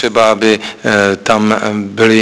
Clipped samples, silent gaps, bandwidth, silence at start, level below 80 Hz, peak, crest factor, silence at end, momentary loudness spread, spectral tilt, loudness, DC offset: 0.4%; none; 11 kHz; 0 s; -48 dBFS; 0 dBFS; 12 dB; 0 s; 5 LU; -4.5 dB/octave; -12 LUFS; under 0.1%